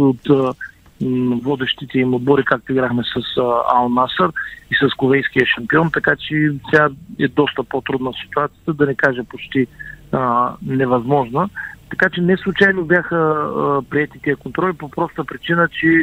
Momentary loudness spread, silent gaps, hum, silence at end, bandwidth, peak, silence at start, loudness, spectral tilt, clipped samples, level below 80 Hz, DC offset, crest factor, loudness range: 8 LU; none; none; 0 s; 16 kHz; 0 dBFS; 0 s; -17 LUFS; -7.5 dB/octave; under 0.1%; -48 dBFS; under 0.1%; 18 dB; 3 LU